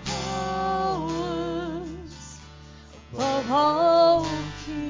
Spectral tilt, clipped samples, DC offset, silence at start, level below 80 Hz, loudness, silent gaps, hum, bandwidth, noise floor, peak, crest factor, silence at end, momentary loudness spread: -5 dB/octave; under 0.1%; under 0.1%; 0 s; -46 dBFS; -24 LUFS; none; none; 7.6 kHz; -46 dBFS; -10 dBFS; 16 dB; 0 s; 21 LU